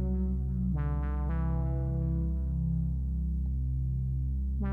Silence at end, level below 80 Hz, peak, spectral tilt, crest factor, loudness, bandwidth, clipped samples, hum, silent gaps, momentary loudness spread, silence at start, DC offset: 0 s; -32 dBFS; -20 dBFS; -11.5 dB/octave; 10 dB; -32 LUFS; 2.4 kHz; under 0.1%; none; none; 2 LU; 0 s; under 0.1%